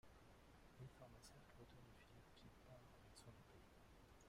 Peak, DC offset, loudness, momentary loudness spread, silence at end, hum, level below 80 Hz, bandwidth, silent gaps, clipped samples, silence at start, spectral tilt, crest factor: -50 dBFS; under 0.1%; -66 LUFS; 5 LU; 0 s; none; -74 dBFS; 15.5 kHz; none; under 0.1%; 0.05 s; -5 dB/octave; 16 dB